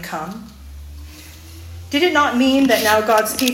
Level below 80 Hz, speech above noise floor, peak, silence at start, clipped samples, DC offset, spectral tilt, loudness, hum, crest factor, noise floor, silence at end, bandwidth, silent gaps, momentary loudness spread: -44 dBFS; 22 dB; -2 dBFS; 0 s; under 0.1%; under 0.1%; -3.5 dB/octave; -16 LUFS; none; 18 dB; -38 dBFS; 0 s; 17 kHz; none; 24 LU